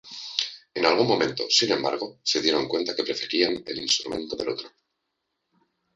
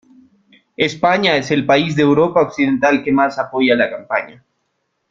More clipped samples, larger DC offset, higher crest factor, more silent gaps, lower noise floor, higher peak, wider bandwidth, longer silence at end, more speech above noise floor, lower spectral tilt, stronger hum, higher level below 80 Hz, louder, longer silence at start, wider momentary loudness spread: neither; neither; first, 24 dB vs 16 dB; neither; first, -79 dBFS vs -70 dBFS; about the same, -2 dBFS vs -2 dBFS; first, 9.4 kHz vs 7.6 kHz; first, 1.25 s vs 0.8 s; about the same, 54 dB vs 55 dB; second, -2.5 dB/octave vs -5.5 dB/octave; neither; second, -64 dBFS vs -56 dBFS; second, -24 LUFS vs -15 LUFS; second, 0.05 s vs 0.8 s; about the same, 9 LU vs 7 LU